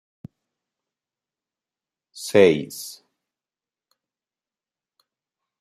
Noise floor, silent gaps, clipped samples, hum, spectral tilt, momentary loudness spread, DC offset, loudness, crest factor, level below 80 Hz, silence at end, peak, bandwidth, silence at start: under -90 dBFS; none; under 0.1%; none; -5 dB/octave; 19 LU; under 0.1%; -18 LUFS; 24 dB; -70 dBFS; 2.7 s; -2 dBFS; 15.5 kHz; 2.15 s